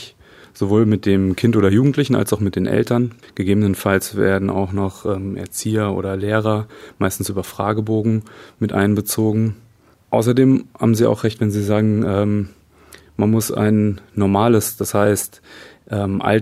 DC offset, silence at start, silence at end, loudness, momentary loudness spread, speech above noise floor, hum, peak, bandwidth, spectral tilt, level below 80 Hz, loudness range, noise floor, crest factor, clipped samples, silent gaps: under 0.1%; 0 s; 0 s; -18 LUFS; 9 LU; 29 dB; none; 0 dBFS; 15.5 kHz; -6.5 dB/octave; -52 dBFS; 4 LU; -46 dBFS; 18 dB; under 0.1%; none